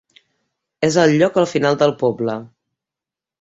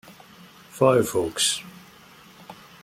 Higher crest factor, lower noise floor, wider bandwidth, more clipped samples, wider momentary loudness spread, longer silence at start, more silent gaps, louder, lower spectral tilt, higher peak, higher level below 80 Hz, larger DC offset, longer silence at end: about the same, 18 dB vs 22 dB; first, -87 dBFS vs -50 dBFS; second, 8.2 kHz vs 16.5 kHz; neither; second, 10 LU vs 25 LU; first, 0.8 s vs 0.1 s; neither; first, -17 LUFS vs -22 LUFS; first, -5.5 dB/octave vs -3.5 dB/octave; first, -2 dBFS vs -6 dBFS; about the same, -60 dBFS vs -60 dBFS; neither; first, 0.95 s vs 0.3 s